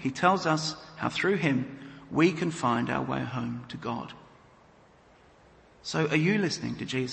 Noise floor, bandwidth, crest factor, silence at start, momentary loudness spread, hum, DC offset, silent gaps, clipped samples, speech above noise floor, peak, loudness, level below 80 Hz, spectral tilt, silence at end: -58 dBFS; 8.8 kHz; 22 dB; 0 s; 12 LU; none; under 0.1%; none; under 0.1%; 30 dB; -8 dBFS; -28 LUFS; -62 dBFS; -5.5 dB/octave; 0 s